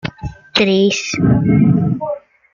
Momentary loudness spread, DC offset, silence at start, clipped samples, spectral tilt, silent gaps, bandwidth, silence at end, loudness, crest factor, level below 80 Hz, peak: 14 LU; under 0.1%; 0.05 s; under 0.1%; -6 dB/octave; none; 7.4 kHz; 0.35 s; -14 LUFS; 14 dB; -40 dBFS; -2 dBFS